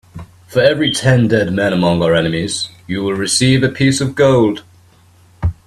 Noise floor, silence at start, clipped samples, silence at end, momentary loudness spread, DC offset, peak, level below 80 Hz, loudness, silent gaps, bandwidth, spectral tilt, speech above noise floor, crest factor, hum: -47 dBFS; 0.15 s; under 0.1%; 0.15 s; 10 LU; under 0.1%; 0 dBFS; -38 dBFS; -14 LUFS; none; 13.5 kHz; -5 dB/octave; 34 dB; 14 dB; none